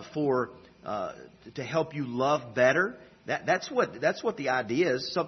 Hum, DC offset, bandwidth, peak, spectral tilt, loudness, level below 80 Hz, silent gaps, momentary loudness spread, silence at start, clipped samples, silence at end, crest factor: none; under 0.1%; 6.4 kHz; -10 dBFS; -5 dB/octave; -29 LUFS; -68 dBFS; none; 14 LU; 0 s; under 0.1%; 0 s; 20 dB